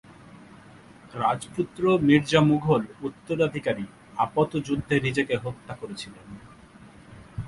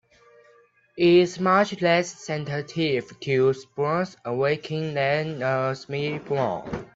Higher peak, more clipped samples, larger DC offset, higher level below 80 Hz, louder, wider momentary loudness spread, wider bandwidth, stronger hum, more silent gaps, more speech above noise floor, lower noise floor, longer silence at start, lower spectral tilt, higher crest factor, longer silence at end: about the same, -4 dBFS vs -6 dBFS; neither; neither; first, -54 dBFS vs -60 dBFS; about the same, -25 LUFS vs -24 LUFS; first, 19 LU vs 10 LU; first, 11.5 kHz vs 7.8 kHz; neither; neither; second, 25 dB vs 35 dB; second, -49 dBFS vs -58 dBFS; second, 0.4 s vs 0.95 s; about the same, -6.5 dB/octave vs -6 dB/octave; about the same, 22 dB vs 18 dB; about the same, 0 s vs 0.1 s